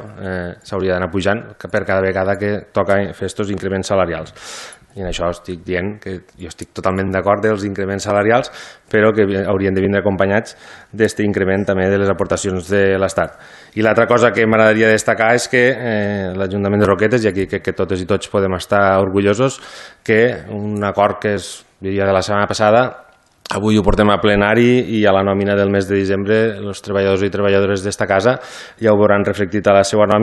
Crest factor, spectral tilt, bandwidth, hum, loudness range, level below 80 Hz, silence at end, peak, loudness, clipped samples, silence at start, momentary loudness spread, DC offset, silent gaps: 16 dB; -5.5 dB/octave; 12.5 kHz; none; 6 LU; -38 dBFS; 0 s; 0 dBFS; -16 LUFS; under 0.1%; 0 s; 13 LU; under 0.1%; none